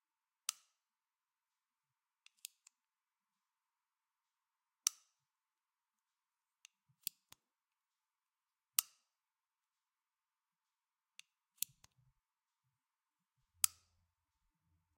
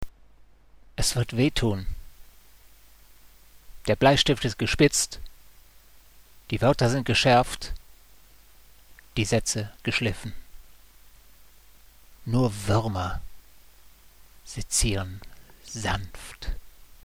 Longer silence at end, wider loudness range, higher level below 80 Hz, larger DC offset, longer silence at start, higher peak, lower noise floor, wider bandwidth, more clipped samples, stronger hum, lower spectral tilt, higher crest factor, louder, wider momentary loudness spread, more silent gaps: first, 1.3 s vs 0.35 s; first, 19 LU vs 7 LU; second, under -90 dBFS vs -40 dBFS; second, under 0.1% vs 0.2%; first, 0.5 s vs 0 s; second, -8 dBFS vs -4 dBFS; first, under -90 dBFS vs -56 dBFS; about the same, 16 kHz vs 16.5 kHz; neither; neither; second, 3.5 dB/octave vs -4 dB/octave; first, 42 dB vs 24 dB; second, -40 LUFS vs -25 LUFS; about the same, 18 LU vs 20 LU; neither